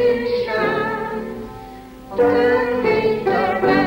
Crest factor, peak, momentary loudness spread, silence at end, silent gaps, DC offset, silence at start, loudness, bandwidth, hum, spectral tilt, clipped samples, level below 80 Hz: 14 dB; -4 dBFS; 17 LU; 0 s; none; under 0.1%; 0 s; -19 LUFS; 16.5 kHz; none; -6.5 dB/octave; under 0.1%; -46 dBFS